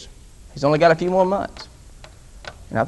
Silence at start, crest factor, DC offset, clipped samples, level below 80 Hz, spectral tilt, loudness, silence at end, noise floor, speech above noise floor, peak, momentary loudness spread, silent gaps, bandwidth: 0 s; 18 dB; under 0.1%; under 0.1%; -44 dBFS; -6.5 dB/octave; -19 LUFS; 0 s; -43 dBFS; 25 dB; -2 dBFS; 24 LU; none; 12 kHz